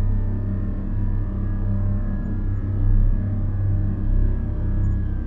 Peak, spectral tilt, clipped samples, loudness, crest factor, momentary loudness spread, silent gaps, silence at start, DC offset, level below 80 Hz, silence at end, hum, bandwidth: -8 dBFS; -12 dB/octave; under 0.1%; -25 LUFS; 12 dB; 4 LU; none; 0 s; under 0.1%; -22 dBFS; 0 s; none; 2.1 kHz